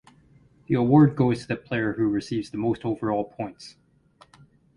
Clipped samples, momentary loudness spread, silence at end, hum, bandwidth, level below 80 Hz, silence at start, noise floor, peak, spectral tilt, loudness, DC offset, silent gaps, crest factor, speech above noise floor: under 0.1%; 17 LU; 1.05 s; none; 11 kHz; -56 dBFS; 0.7 s; -58 dBFS; -6 dBFS; -8 dB/octave; -24 LUFS; under 0.1%; none; 20 dB; 34 dB